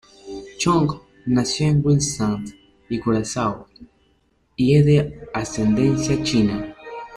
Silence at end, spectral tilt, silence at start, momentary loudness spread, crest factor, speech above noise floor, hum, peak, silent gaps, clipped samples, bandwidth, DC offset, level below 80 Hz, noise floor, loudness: 0 s; -6 dB/octave; 0.25 s; 18 LU; 16 dB; 43 dB; none; -6 dBFS; none; under 0.1%; 11.5 kHz; under 0.1%; -44 dBFS; -63 dBFS; -20 LUFS